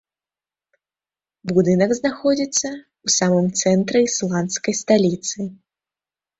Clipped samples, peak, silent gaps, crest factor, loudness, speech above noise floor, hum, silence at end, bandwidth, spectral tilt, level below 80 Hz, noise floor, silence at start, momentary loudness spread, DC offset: under 0.1%; -4 dBFS; none; 18 dB; -19 LUFS; over 71 dB; none; 0.85 s; 8.2 kHz; -4.5 dB/octave; -60 dBFS; under -90 dBFS; 1.45 s; 11 LU; under 0.1%